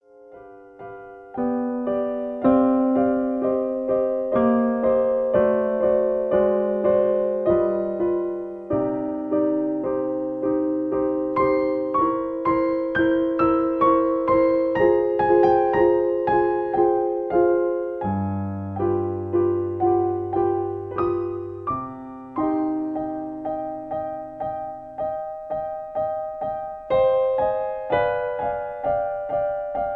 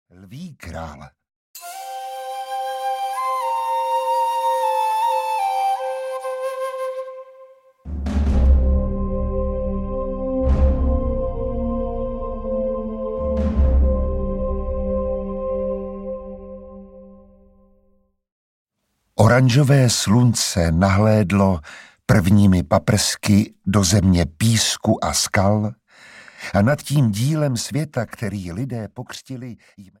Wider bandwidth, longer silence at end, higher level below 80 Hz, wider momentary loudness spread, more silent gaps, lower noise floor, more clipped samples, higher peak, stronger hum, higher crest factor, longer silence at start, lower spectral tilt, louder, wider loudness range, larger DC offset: second, 4.5 kHz vs 16.5 kHz; second, 0 s vs 0.15 s; second, -52 dBFS vs -28 dBFS; second, 10 LU vs 17 LU; second, none vs 1.36-1.54 s, 18.32-18.65 s; second, -45 dBFS vs -72 dBFS; neither; second, -6 dBFS vs -2 dBFS; neither; about the same, 16 dB vs 18 dB; about the same, 0.2 s vs 0.2 s; first, -10 dB/octave vs -5.5 dB/octave; about the same, -22 LUFS vs -20 LUFS; about the same, 8 LU vs 10 LU; neither